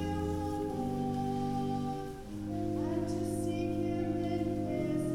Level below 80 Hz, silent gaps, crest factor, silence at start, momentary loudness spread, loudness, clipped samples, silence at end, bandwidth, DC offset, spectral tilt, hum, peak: -52 dBFS; none; 12 dB; 0 s; 4 LU; -35 LUFS; under 0.1%; 0 s; 16.5 kHz; under 0.1%; -7.5 dB/octave; none; -20 dBFS